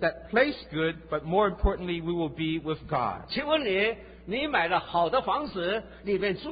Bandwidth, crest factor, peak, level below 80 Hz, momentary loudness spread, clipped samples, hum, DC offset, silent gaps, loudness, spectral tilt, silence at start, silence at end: 5 kHz; 18 dB; -10 dBFS; -42 dBFS; 6 LU; under 0.1%; none; under 0.1%; none; -28 LUFS; -9.5 dB/octave; 0 s; 0 s